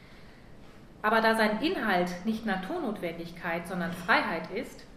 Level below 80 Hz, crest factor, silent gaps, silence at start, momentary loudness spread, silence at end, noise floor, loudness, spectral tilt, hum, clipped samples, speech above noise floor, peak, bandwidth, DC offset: -56 dBFS; 22 dB; none; 0 s; 11 LU; 0 s; -50 dBFS; -29 LUFS; -5.5 dB/octave; none; under 0.1%; 21 dB; -8 dBFS; 15.5 kHz; under 0.1%